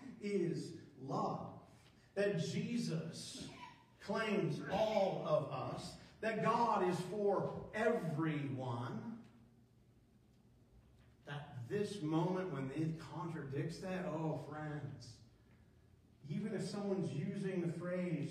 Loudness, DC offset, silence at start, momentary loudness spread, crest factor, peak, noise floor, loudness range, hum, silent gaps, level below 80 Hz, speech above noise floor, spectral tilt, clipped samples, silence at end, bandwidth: -40 LUFS; under 0.1%; 0 s; 14 LU; 18 dB; -22 dBFS; -68 dBFS; 8 LU; none; none; -72 dBFS; 29 dB; -6.5 dB/octave; under 0.1%; 0 s; 14 kHz